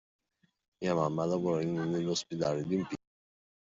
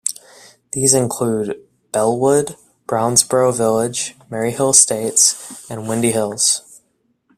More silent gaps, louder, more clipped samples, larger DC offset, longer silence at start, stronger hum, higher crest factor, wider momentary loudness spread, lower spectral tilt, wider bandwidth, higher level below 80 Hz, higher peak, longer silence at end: neither; second, -33 LUFS vs -16 LUFS; neither; neither; first, 0.8 s vs 0.05 s; neither; about the same, 18 dB vs 18 dB; second, 6 LU vs 16 LU; first, -6 dB/octave vs -3 dB/octave; second, 8 kHz vs 16 kHz; second, -70 dBFS vs -56 dBFS; second, -16 dBFS vs 0 dBFS; first, 0.75 s vs 0.6 s